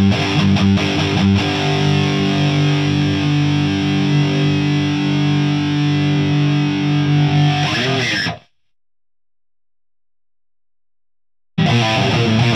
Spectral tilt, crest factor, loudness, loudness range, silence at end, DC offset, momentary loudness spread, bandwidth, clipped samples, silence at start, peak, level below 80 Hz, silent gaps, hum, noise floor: -6 dB/octave; 12 dB; -16 LUFS; 8 LU; 0 s; 0.1%; 3 LU; 9.6 kHz; under 0.1%; 0 s; -4 dBFS; -48 dBFS; none; none; under -90 dBFS